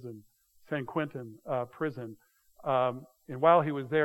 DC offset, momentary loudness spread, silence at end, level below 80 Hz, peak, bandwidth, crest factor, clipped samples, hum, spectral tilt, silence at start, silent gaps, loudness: under 0.1%; 21 LU; 0 s; -74 dBFS; -10 dBFS; 12.5 kHz; 22 dB; under 0.1%; none; -8 dB/octave; 0 s; none; -30 LUFS